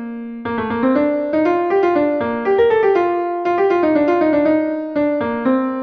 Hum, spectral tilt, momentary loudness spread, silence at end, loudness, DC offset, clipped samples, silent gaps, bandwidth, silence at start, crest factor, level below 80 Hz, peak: none; -8 dB/octave; 6 LU; 0 s; -17 LUFS; under 0.1%; under 0.1%; none; 6.2 kHz; 0 s; 12 dB; -52 dBFS; -4 dBFS